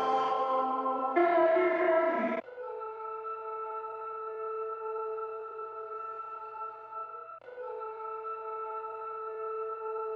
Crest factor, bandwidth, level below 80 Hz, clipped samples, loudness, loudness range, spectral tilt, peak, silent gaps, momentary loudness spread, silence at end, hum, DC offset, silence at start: 18 dB; 6.8 kHz; -86 dBFS; under 0.1%; -33 LUFS; 11 LU; -6 dB/octave; -16 dBFS; none; 15 LU; 0 s; none; under 0.1%; 0 s